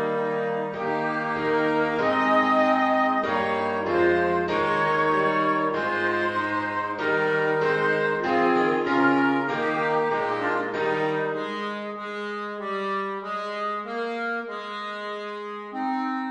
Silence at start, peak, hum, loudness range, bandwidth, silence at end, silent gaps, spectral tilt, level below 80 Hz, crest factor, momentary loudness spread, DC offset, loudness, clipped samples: 0 s; -8 dBFS; none; 8 LU; 10 kHz; 0 s; none; -6 dB/octave; -64 dBFS; 16 dB; 11 LU; under 0.1%; -24 LUFS; under 0.1%